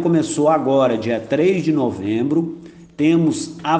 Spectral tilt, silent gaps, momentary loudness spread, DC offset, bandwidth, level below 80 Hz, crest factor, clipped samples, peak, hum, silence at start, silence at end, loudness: -6.5 dB/octave; none; 6 LU; under 0.1%; 9.4 kHz; -58 dBFS; 14 dB; under 0.1%; -4 dBFS; none; 0 s; 0 s; -18 LUFS